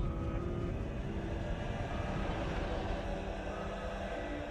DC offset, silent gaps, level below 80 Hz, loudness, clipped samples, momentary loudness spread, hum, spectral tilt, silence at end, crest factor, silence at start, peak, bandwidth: under 0.1%; none; -42 dBFS; -39 LUFS; under 0.1%; 3 LU; none; -7 dB/octave; 0 s; 14 dB; 0 s; -24 dBFS; 9.4 kHz